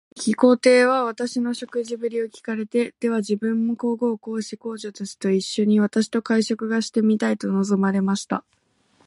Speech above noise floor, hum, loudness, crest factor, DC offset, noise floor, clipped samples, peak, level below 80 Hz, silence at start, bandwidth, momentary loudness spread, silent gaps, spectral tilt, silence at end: 40 dB; none; -22 LUFS; 18 dB; under 0.1%; -62 dBFS; under 0.1%; -4 dBFS; -70 dBFS; 0.15 s; 11.5 kHz; 12 LU; none; -5.5 dB/octave; 0.65 s